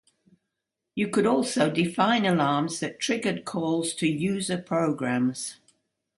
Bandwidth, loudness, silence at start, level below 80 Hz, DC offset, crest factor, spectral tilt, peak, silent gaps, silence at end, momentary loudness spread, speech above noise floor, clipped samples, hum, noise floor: 11.5 kHz; -26 LUFS; 0.95 s; -68 dBFS; under 0.1%; 20 dB; -5 dB/octave; -6 dBFS; none; 0.65 s; 7 LU; 59 dB; under 0.1%; none; -84 dBFS